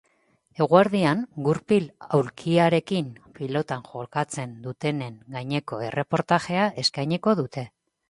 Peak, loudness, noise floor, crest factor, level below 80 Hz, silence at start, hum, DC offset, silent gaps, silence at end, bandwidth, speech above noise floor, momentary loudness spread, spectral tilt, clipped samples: -2 dBFS; -24 LUFS; -66 dBFS; 22 dB; -64 dBFS; 0.6 s; none; under 0.1%; none; 0.4 s; 11.5 kHz; 41 dB; 14 LU; -6 dB/octave; under 0.1%